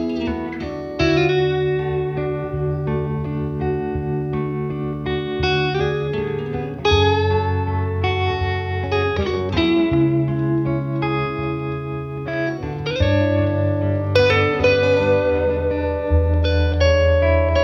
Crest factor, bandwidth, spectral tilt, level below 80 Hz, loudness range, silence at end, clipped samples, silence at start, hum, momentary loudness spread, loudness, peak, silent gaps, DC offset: 18 dB; 6.8 kHz; -7.5 dB/octave; -32 dBFS; 5 LU; 0 s; under 0.1%; 0 s; none; 9 LU; -20 LUFS; -2 dBFS; none; under 0.1%